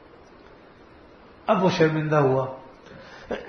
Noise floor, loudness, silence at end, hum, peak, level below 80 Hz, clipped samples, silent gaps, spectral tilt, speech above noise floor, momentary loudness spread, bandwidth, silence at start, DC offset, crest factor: -50 dBFS; -23 LUFS; 0 s; none; -6 dBFS; -58 dBFS; under 0.1%; none; -7 dB/octave; 29 dB; 24 LU; 6.6 kHz; 1.45 s; under 0.1%; 18 dB